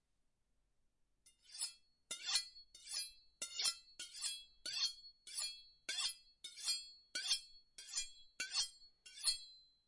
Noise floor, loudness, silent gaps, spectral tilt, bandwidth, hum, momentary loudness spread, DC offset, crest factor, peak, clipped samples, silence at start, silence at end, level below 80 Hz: -82 dBFS; -42 LUFS; none; 3.5 dB/octave; 11.5 kHz; none; 15 LU; under 0.1%; 26 dB; -20 dBFS; under 0.1%; 1.25 s; 0.25 s; -76 dBFS